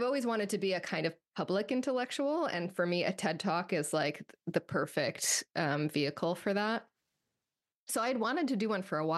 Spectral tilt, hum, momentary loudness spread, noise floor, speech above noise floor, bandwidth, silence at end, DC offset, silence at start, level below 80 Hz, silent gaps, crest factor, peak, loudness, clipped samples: -4 dB/octave; none; 5 LU; under -90 dBFS; over 57 dB; 12.5 kHz; 0 s; under 0.1%; 0 s; -80 dBFS; 7.76-7.87 s; 18 dB; -16 dBFS; -33 LUFS; under 0.1%